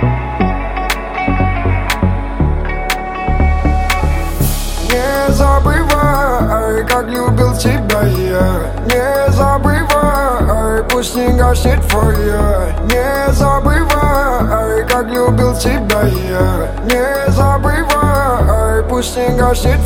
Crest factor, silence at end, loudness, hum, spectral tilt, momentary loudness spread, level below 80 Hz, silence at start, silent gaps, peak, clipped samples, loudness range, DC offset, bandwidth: 12 dB; 0 s; -13 LUFS; none; -5.5 dB/octave; 5 LU; -16 dBFS; 0 s; none; 0 dBFS; under 0.1%; 3 LU; under 0.1%; 17 kHz